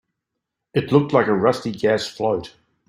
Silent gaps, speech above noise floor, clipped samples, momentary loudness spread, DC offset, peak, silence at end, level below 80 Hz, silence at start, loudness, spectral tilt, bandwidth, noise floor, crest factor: none; 62 dB; under 0.1%; 8 LU; under 0.1%; -2 dBFS; 0.4 s; -58 dBFS; 0.75 s; -20 LUFS; -6.5 dB/octave; 15 kHz; -81 dBFS; 18 dB